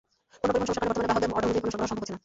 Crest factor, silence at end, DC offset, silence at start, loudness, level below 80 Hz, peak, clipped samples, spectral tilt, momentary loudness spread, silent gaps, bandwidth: 16 dB; 0.05 s; under 0.1%; 0.45 s; -28 LUFS; -50 dBFS; -12 dBFS; under 0.1%; -5 dB/octave; 5 LU; none; 8 kHz